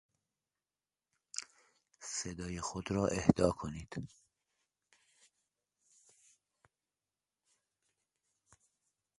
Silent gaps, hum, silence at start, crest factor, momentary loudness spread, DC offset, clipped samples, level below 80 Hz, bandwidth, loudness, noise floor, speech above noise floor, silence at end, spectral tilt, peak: none; none; 1.35 s; 32 dB; 17 LU; under 0.1%; under 0.1%; -60 dBFS; 11.5 kHz; -36 LUFS; under -90 dBFS; over 55 dB; 5.1 s; -5.5 dB/octave; -10 dBFS